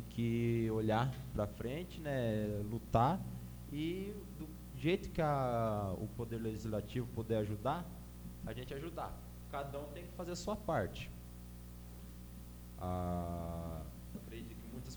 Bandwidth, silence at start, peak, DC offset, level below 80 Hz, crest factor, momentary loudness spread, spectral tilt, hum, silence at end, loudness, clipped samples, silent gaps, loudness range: over 20 kHz; 0 s; -16 dBFS; under 0.1%; -52 dBFS; 22 dB; 16 LU; -7 dB/octave; 60 Hz at -50 dBFS; 0 s; -40 LUFS; under 0.1%; none; 7 LU